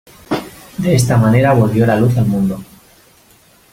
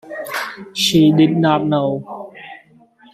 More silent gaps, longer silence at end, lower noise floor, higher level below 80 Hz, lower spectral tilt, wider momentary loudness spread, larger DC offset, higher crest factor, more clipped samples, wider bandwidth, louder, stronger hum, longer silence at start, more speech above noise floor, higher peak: neither; first, 1.1 s vs 0.55 s; about the same, -48 dBFS vs -49 dBFS; first, -42 dBFS vs -56 dBFS; first, -7 dB/octave vs -5.5 dB/octave; second, 12 LU vs 21 LU; neither; about the same, 14 dB vs 16 dB; neither; about the same, 16 kHz vs 15 kHz; about the same, -14 LUFS vs -16 LUFS; neither; first, 0.3 s vs 0.05 s; about the same, 37 dB vs 34 dB; about the same, 0 dBFS vs -2 dBFS